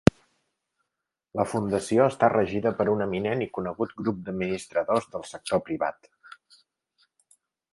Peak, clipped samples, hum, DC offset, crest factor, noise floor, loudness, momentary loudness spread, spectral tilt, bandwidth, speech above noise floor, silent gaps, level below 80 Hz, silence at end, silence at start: 0 dBFS; under 0.1%; none; under 0.1%; 26 dB; -85 dBFS; -27 LUFS; 9 LU; -6.5 dB/octave; 11.5 kHz; 59 dB; none; -52 dBFS; 1.8 s; 1.35 s